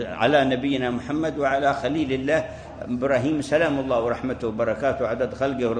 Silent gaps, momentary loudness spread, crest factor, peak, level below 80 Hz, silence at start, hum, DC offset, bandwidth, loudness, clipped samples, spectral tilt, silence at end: none; 6 LU; 18 dB; -6 dBFS; -48 dBFS; 0 s; none; under 0.1%; 9.8 kHz; -23 LUFS; under 0.1%; -6 dB/octave; 0 s